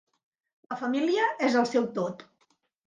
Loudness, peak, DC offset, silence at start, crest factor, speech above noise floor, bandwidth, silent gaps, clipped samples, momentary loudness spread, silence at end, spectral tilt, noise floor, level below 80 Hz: -27 LUFS; -12 dBFS; under 0.1%; 0.7 s; 16 dB; 45 dB; 9.6 kHz; none; under 0.1%; 12 LU; 0.65 s; -5 dB/octave; -71 dBFS; -78 dBFS